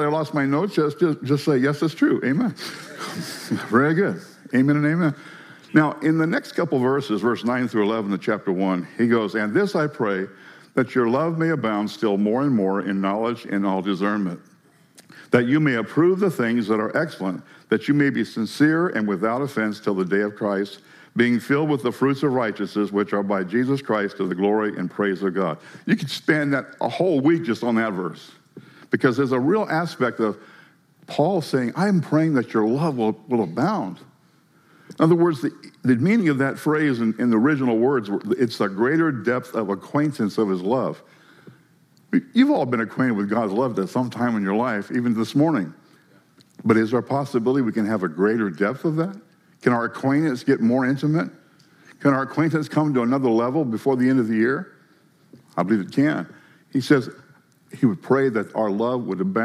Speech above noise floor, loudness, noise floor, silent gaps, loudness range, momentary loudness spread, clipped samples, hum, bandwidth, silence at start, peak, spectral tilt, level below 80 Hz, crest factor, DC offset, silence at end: 36 dB; -22 LUFS; -58 dBFS; none; 2 LU; 7 LU; under 0.1%; none; 14.5 kHz; 0 s; -2 dBFS; -7 dB/octave; -78 dBFS; 20 dB; under 0.1%; 0 s